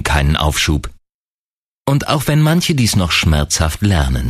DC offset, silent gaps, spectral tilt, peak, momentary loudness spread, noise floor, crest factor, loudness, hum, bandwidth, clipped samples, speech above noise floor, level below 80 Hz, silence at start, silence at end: under 0.1%; 1.14-1.83 s; -4.5 dB/octave; 0 dBFS; 5 LU; under -90 dBFS; 14 dB; -15 LUFS; none; 15.5 kHz; under 0.1%; over 76 dB; -24 dBFS; 0 s; 0 s